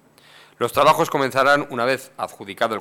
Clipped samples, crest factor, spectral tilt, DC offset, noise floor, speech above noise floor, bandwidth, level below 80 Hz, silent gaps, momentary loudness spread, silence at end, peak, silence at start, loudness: under 0.1%; 16 dB; -4 dB/octave; under 0.1%; -50 dBFS; 30 dB; 18 kHz; -58 dBFS; none; 14 LU; 0 s; -6 dBFS; 0.6 s; -19 LUFS